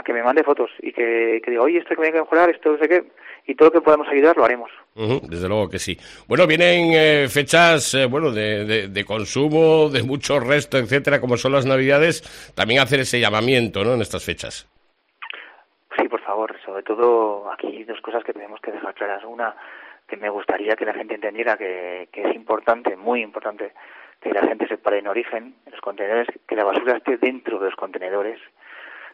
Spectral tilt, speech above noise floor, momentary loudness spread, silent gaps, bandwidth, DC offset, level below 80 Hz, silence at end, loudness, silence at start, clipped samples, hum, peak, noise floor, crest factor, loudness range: -4.5 dB/octave; 43 dB; 17 LU; none; 14 kHz; under 0.1%; -56 dBFS; 0.05 s; -19 LUFS; 0.05 s; under 0.1%; none; -2 dBFS; -63 dBFS; 18 dB; 9 LU